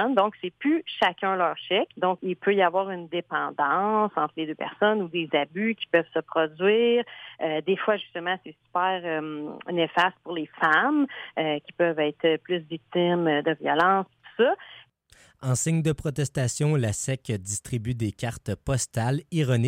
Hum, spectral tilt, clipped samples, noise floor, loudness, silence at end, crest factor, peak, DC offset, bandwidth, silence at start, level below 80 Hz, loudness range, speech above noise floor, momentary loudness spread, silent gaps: none; -5 dB/octave; under 0.1%; -58 dBFS; -26 LUFS; 0 s; 18 dB; -8 dBFS; under 0.1%; 16 kHz; 0 s; -56 dBFS; 3 LU; 33 dB; 9 LU; none